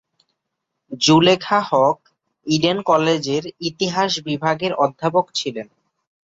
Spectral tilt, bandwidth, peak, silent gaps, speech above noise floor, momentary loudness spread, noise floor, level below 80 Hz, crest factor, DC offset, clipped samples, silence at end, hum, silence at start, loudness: -4.5 dB/octave; 8 kHz; -2 dBFS; none; 60 dB; 13 LU; -78 dBFS; -60 dBFS; 18 dB; under 0.1%; under 0.1%; 0.65 s; none; 0.9 s; -18 LUFS